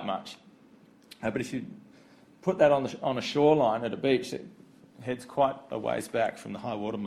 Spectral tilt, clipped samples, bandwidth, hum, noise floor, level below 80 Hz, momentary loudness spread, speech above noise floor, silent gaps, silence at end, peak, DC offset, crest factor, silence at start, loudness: -6 dB/octave; under 0.1%; 13.5 kHz; none; -57 dBFS; -66 dBFS; 15 LU; 29 dB; none; 0 s; -10 dBFS; under 0.1%; 20 dB; 0 s; -29 LUFS